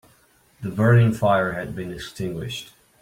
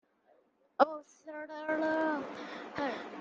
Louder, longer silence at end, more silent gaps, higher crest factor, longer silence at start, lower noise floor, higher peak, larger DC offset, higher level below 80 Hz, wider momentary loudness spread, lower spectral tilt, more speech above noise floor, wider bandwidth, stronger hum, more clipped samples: first, -22 LUFS vs -34 LUFS; first, 0.4 s vs 0 s; neither; second, 18 dB vs 26 dB; second, 0.6 s vs 0.8 s; second, -58 dBFS vs -69 dBFS; about the same, -6 dBFS vs -8 dBFS; neither; first, -50 dBFS vs -78 dBFS; about the same, 16 LU vs 16 LU; first, -7 dB/octave vs -5 dB/octave; about the same, 37 dB vs 35 dB; first, 15.5 kHz vs 7.6 kHz; neither; neither